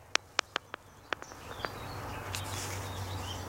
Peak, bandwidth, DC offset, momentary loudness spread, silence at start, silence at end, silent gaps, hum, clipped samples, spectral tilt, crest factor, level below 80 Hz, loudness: -2 dBFS; 16.5 kHz; under 0.1%; 9 LU; 0 s; 0 s; none; none; under 0.1%; -2.5 dB/octave; 38 dB; -56 dBFS; -38 LUFS